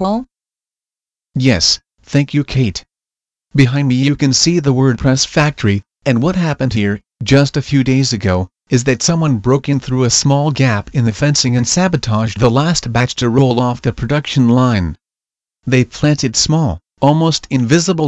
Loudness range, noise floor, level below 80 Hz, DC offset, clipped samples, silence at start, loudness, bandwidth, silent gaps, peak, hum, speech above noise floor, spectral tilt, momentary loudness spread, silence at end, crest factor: 2 LU; under -90 dBFS; -38 dBFS; under 0.1%; under 0.1%; 0 s; -14 LUFS; 8.4 kHz; none; 0 dBFS; none; over 77 dB; -5 dB/octave; 6 LU; 0 s; 14 dB